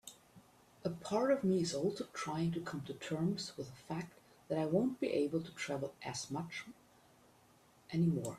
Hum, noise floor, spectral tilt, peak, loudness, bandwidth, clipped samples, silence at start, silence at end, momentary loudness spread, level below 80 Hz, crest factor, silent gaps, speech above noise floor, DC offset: none; -67 dBFS; -6 dB/octave; -20 dBFS; -38 LUFS; 14 kHz; under 0.1%; 0.05 s; 0 s; 11 LU; -72 dBFS; 18 dB; none; 29 dB; under 0.1%